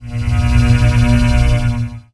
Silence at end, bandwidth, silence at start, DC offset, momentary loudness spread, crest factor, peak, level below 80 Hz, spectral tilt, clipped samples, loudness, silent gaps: 0.1 s; 11 kHz; 0 s; under 0.1%; 7 LU; 12 dB; 0 dBFS; -16 dBFS; -7 dB/octave; under 0.1%; -14 LUFS; none